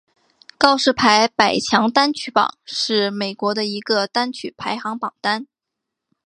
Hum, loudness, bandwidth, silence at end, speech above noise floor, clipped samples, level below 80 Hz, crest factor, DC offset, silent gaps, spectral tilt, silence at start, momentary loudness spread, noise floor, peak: none; -18 LUFS; 11 kHz; 0.8 s; 63 dB; under 0.1%; -58 dBFS; 20 dB; under 0.1%; none; -3 dB/octave; 0.6 s; 11 LU; -82 dBFS; 0 dBFS